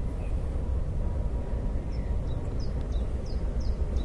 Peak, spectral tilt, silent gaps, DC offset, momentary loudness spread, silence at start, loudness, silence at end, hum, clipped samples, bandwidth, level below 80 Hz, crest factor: -16 dBFS; -8 dB/octave; none; under 0.1%; 1 LU; 0 s; -33 LUFS; 0 s; none; under 0.1%; 9.2 kHz; -30 dBFS; 12 dB